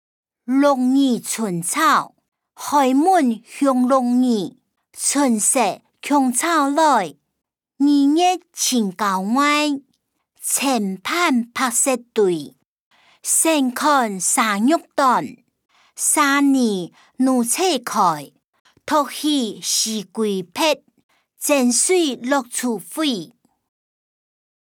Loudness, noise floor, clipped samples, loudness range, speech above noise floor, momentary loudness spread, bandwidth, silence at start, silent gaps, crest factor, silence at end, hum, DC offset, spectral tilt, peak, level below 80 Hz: -18 LUFS; -69 dBFS; under 0.1%; 3 LU; 51 dB; 8 LU; 20 kHz; 0.5 s; 2.28-2.32 s, 12.65-12.91 s, 18.44-18.53 s, 18.60-18.65 s, 21.04-21.09 s; 16 dB; 1.4 s; none; under 0.1%; -2.5 dB/octave; -4 dBFS; -74 dBFS